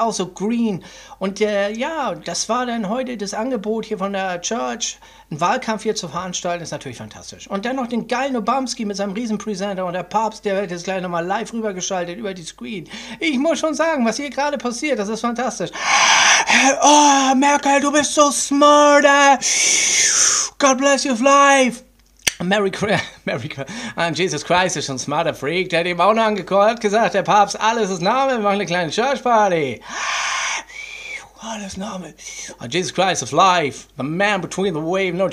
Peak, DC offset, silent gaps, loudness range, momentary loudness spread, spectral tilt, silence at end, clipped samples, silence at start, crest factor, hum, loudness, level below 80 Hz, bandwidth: 0 dBFS; under 0.1%; none; 11 LU; 16 LU; -2.5 dB/octave; 0 s; under 0.1%; 0 s; 18 dB; none; -17 LUFS; -54 dBFS; 16 kHz